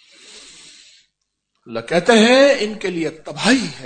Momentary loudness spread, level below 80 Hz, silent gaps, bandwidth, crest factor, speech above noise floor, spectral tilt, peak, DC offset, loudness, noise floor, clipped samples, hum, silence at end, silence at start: 15 LU; -58 dBFS; none; 9.4 kHz; 18 dB; 57 dB; -4 dB/octave; 0 dBFS; under 0.1%; -15 LUFS; -73 dBFS; under 0.1%; none; 0 s; 0.35 s